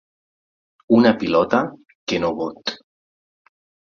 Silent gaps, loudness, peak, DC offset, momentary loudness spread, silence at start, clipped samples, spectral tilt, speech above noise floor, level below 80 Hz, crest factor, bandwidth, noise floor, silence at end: 1.95-2.07 s; -19 LUFS; -2 dBFS; under 0.1%; 14 LU; 0.9 s; under 0.1%; -6 dB/octave; over 72 dB; -56 dBFS; 20 dB; 7 kHz; under -90 dBFS; 1.2 s